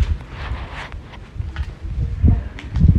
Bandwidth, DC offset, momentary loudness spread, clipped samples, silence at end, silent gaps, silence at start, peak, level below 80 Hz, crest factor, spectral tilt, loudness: 7 kHz; under 0.1%; 15 LU; under 0.1%; 0 s; none; 0 s; -2 dBFS; -24 dBFS; 18 dB; -8.5 dB/octave; -24 LUFS